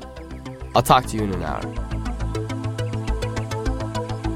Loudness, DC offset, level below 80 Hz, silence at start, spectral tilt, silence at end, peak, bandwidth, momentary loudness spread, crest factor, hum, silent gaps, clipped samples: -24 LUFS; under 0.1%; -32 dBFS; 0 s; -5.5 dB/octave; 0 s; -2 dBFS; 16 kHz; 12 LU; 22 dB; none; none; under 0.1%